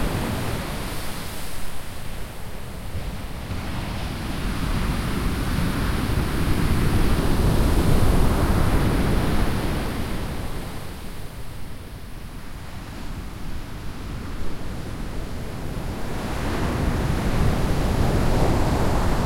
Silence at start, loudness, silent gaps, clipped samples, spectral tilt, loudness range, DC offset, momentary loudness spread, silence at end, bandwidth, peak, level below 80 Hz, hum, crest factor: 0 s; -26 LUFS; none; under 0.1%; -6 dB/octave; 13 LU; under 0.1%; 15 LU; 0 s; 16.5 kHz; -6 dBFS; -28 dBFS; none; 16 dB